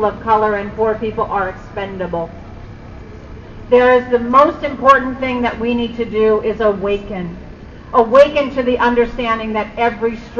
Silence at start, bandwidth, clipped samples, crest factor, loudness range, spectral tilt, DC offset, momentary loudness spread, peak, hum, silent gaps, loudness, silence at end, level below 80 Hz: 0 s; 7.2 kHz; under 0.1%; 16 dB; 6 LU; -6.5 dB/octave; under 0.1%; 24 LU; 0 dBFS; none; none; -15 LUFS; 0 s; -36 dBFS